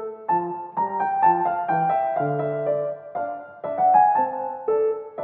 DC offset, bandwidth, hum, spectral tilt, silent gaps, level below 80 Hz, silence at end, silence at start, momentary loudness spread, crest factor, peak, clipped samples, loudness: under 0.1%; 3.8 kHz; none; -7 dB/octave; none; -76 dBFS; 0 s; 0 s; 12 LU; 16 dB; -6 dBFS; under 0.1%; -23 LUFS